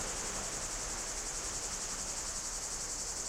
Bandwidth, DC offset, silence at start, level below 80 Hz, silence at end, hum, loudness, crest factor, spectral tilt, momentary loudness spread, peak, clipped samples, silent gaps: 16.5 kHz; under 0.1%; 0 s; -50 dBFS; 0 s; none; -36 LUFS; 14 dB; -0.5 dB/octave; 0 LU; -26 dBFS; under 0.1%; none